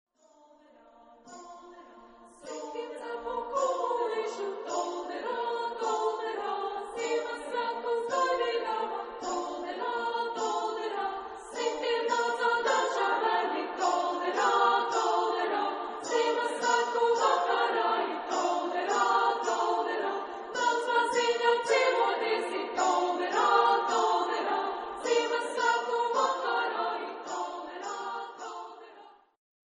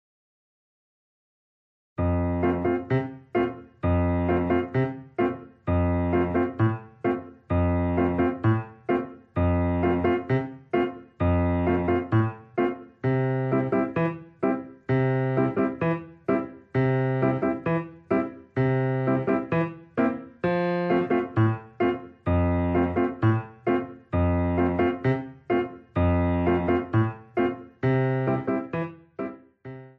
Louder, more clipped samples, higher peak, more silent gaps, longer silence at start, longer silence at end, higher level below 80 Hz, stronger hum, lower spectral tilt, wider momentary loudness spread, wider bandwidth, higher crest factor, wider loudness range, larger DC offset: second, -29 LUFS vs -26 LUFS; neither; about the same, -10 dBFS vs -10 dBFS; neither; second, 1.25 s vs 2 s; first, 0.65 s vs 0.1 s; second, -74 dBFS vs -44 dBFS; neither; second, -1 dB/octave vs -10.5 dB/octave; first, 11 LU vs 6 LU; first, 10 kHz vs 4.6 kHz; about the same, 20 dB vs 16 dB; first, 6 LU vs 1 LU; neither